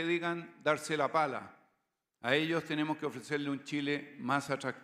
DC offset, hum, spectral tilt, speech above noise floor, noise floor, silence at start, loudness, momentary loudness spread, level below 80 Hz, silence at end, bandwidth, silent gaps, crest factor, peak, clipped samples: under 0.1%; none; -5 dB/octave; 48 dB; -82 dBFS; 0 s; -34 LUFS; 7 LU; -82 dBFS; 0 s; 15 kHz; none; 22 dB; -12 dBFS; under 0.1%